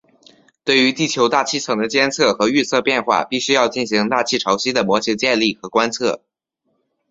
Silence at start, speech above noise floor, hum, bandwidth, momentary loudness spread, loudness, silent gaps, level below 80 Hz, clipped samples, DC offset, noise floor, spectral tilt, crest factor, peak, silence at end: 0.65 s; 53 dB; none; 8 kHz; 4 LU; -17 LUFS; none; -60 dBFS; under 0.1%; under 0.1%; -70 dBFS; -3 dB/octave; 18 dB; 0 dBFS; 0.95 s